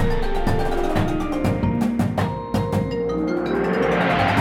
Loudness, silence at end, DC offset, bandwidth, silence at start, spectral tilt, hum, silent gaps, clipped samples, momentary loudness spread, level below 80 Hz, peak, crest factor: -22 LUFS; 0 s; under 0.1%; 15 kHz; 0 s; -7 dB/octave; none; none; under 0.1%; 5 LU; -28 dBFS; -8 dBFS; 14 dB